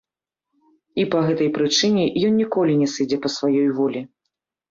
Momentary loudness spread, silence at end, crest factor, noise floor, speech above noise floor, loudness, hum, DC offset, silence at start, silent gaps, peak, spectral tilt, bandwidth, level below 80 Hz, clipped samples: 6 LU; 0.65 s; 14 dB; -86 dBFS; 67 dB; -20 LUFS; none; under 0.1%; 0.95 s; none; -6 dBFS; -5 dB/octave; 7.6 kHz; -62 dBFS; under 0.1%